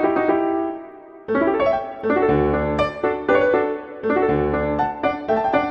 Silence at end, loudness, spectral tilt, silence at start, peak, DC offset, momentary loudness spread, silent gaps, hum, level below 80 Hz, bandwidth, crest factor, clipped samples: 0 s; -20 LUFS; -8.5 dB/octave; 0 s; -4 dBFS; under 0.1%; 7 LU; none; none; -40 dBFS; 7.2 kHz; 16 dB; under 0.1%